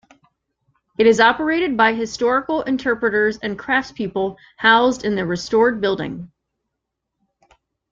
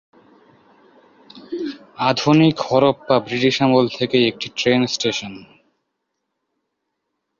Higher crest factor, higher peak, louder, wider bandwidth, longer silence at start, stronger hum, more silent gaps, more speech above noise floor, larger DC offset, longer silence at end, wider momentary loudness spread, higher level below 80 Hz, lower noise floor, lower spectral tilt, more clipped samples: about the same, 20 dB vs 18 dB; about the same, 0 dBFS vs -2 dBFS; about the same, -18 LUFS vs -18 LUFS; about the same, 7.8 kHz vs 7.4 kHz; second, 1 s vs 1.35 s; neither; neither; about the same, 61 dB vs 59 dB; neither; second, 1.65 s vs 1.95 s; about the same, 12 LU vs 13 LU; about the same, -54 dBFS vs -58 dBFS; about the same, -79 dBFS vs -76 dBFS; about the same, -4.5 dB/octave vs -5.5 dB/octave; neither